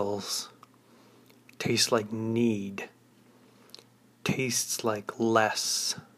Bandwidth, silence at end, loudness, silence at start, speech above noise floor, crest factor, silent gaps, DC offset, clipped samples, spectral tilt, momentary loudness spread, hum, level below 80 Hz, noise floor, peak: 15.5 kHz; 0.15 s; -28 LUFS; 0 s; 31 dB; 22 dB; none; under 0.1%; under 0.1%; -3 dB/octave; 11 LU; none; -70 dBFS; -59 dBFS; -10 dBFS